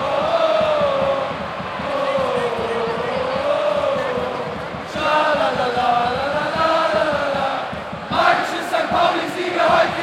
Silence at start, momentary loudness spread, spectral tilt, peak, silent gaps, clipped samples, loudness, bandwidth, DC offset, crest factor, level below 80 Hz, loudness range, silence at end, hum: 0 s; 8 LU; -4.5 dB/octave; -2 dBFS; none; under 0.1%; -19 LUFS; 14.5 kHz; under 0.1%; 18 dB; -50 dBFS; 2 LU; 0 s; none